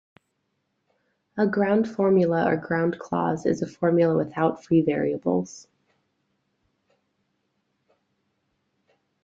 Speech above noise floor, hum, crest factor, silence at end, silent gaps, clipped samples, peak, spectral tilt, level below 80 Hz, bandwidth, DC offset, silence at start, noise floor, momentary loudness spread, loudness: 53 dB; none; 18 dB; 3.65 s; none; under 0.1%; -8 dBFS; -8 dB/octave; -66 dBFS; 7.8 kHz; under 0.1%; 1.35 s; -75 dBFS; 6 LU; -23 LUFS